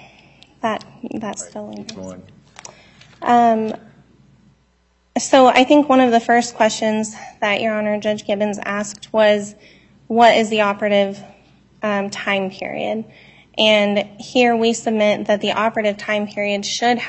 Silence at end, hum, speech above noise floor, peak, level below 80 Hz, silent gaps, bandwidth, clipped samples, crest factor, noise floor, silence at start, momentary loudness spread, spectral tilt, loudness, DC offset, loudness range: 0 s; none; 43 dB; 0 dBFS; -60 dBFS; none; 8.6 kHz; under 0.1%; 18 dB; -60 dBFS; 0.65 s; 16 LU; -4 dB/octave; -17 LUFS; under 0.1%; 7 LU